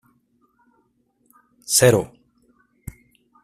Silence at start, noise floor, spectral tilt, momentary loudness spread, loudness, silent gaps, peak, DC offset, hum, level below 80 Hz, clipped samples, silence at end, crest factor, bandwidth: 1.7 s; -66 dBFS; -3.5 dB/octave; 27 LU; -17 LUFS; none; -2 dBFS; under 0.1%; none; -54 dBFS; under 0.1%; 1.4 s; 22 dB; 15.5 kHz